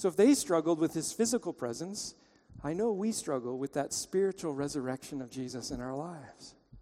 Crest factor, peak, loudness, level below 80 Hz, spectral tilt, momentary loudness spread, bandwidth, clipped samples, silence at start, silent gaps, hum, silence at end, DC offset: 18 dB; -14 dBFS; -33 LUFS; -62 dBFS; -4.5 dB/octave; 14 LU; 16 kHz; under 0.1%; 0 s; none; none; 0 s; under 0.1%